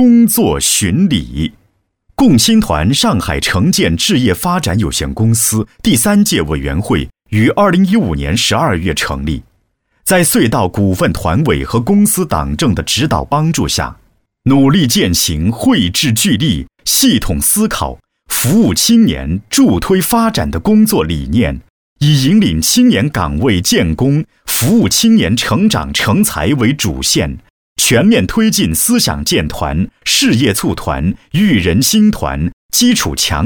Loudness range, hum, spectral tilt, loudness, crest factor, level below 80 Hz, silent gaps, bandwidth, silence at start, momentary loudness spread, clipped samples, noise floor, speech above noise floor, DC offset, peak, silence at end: 2 LU; none; -4 dB/octave; -12 LUFS; 12 dB; -30 dBFS; 21.70-21.96 s, 27.50-27.76 s, 32.53-32.69 s; over 20 kHz; 0 s; 8 LU; under 0.1%; -60 dBFS; 49 dB; 0.2%; 0 dBFS; 0 s